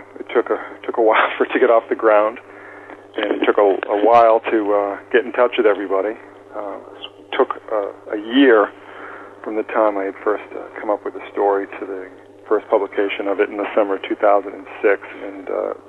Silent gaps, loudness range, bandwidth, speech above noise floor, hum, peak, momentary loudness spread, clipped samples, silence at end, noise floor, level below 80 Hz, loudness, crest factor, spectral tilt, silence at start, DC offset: none; 6 LU; 4.7 kHz; 21 dB; none; -2 dBFS; 18 LU; under 0.1%; 0.15 s; -38 dBFS; -70 dBFS; -18 LUFS; 16 dB; -6 dB/octave; 0 s; under 0.1%